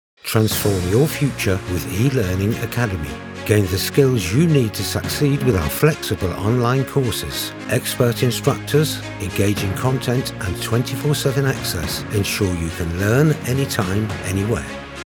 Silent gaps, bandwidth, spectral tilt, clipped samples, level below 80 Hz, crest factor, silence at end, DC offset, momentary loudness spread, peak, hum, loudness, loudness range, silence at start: none; over 20 kHz; -5.5 dB/octave; under 0.1%; -40 dBFS; 18 dB; 0.1 s; under 0.1%; 7 LU; 0 dBFS; none; -20 LUFS; 2 LU; 0.25 s